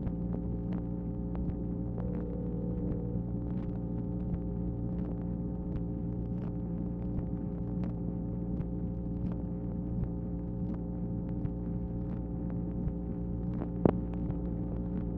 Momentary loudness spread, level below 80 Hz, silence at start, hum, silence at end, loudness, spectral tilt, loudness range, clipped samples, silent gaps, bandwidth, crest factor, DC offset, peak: 2 LU; -42 dBFS; 0 s; none; 0 s; -36 LUFS; -13 dB/octave; 2 LU; under 0.1%; none; 3.1 kHz; 26 dB; under 0.1%; -8 dBFS